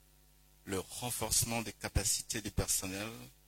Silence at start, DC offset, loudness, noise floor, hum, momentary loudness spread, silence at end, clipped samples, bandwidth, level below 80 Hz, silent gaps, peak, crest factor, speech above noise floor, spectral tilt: 0.65 s; under 0.1%; -35 LUFS; -64 dBFS; none; 11 LU; 0.15 s; under 0.1%; 16.5 kHz; -50 dBFS; none; -16 dBFS; 22 dB; 28 dB; -2.5 dB/octave